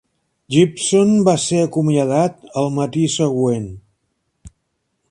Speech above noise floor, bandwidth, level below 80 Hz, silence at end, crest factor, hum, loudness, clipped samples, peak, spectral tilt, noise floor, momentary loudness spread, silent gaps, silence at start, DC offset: 55 dB; 11.5 kHz; -52 dBFS; 0.65 s; 18 dB; none; -17 LUFS; under 0.1%; 0 dBFS; -5.5 dB/octave; -71 dBFS; 7 LU; none; 0.5 s; under 0.1%